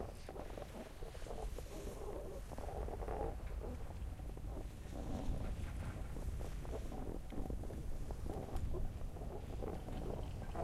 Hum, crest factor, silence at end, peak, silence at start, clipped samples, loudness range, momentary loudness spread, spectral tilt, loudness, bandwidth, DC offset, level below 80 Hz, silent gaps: none; 16 dB; 0 s; -28 dBFS; 0 s; under 0.1%; 1 LU; 5 LU; -6.5 dB/octave; -47 LUFS; 15.5 kHz; under 0.1%; -46 dBFS; none